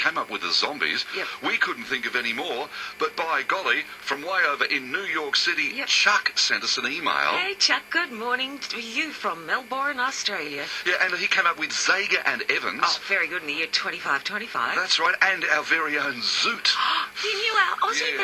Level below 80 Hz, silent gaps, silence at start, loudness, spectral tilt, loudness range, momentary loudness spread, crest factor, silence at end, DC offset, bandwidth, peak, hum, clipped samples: -70 dBFS; none; 0 s; -23 LUFS; -0.5 dB/octave; 4 LU; 7 LU; 22 dB; 0 s; under 0.1%; 19 kHz; -2 dBFS; none; under 0.1%